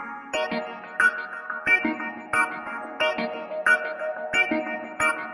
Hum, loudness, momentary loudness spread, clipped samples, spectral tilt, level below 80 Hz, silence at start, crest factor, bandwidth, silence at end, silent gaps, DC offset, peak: none; -25 LUFS; 11 LU; under 0.1%; -3 dB/octave; -64 dBFS; 0 s; 18 dB; 11.5 kHz; 0 s; none; under 0.1%; -8 dBFS